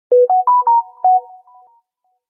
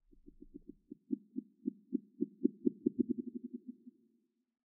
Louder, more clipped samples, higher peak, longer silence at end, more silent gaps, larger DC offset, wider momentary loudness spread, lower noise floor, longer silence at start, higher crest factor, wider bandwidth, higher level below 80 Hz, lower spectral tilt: first, -14 LUFS vs -40 LUFS; neither; first, -4 dBFS vs -16 dBFS; first, 1.1 s vs 0.9 s; neither; neither; second, 3 LU vs 21 LU; second, -67 dBFS vs -78 dBFS; second, 0.1 s vs 0.4 s; second, 10 dB vs 26 dB; first, 1.9 kHz vs 0.5 kHz; second, -78 dBFS vs -72 dBFS; first, -6.5 dB/octave vs 2 dB/octave